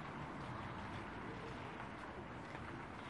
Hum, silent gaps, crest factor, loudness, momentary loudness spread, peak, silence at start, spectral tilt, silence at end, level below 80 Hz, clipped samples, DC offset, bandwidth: none; none; 14 dB; -49 LUFS; 2 LU; -34 dBFS; 0 s; -6 dB/octave; 0 s; -64 dBFS; under 0.1%; under 0.1%; 11 kHz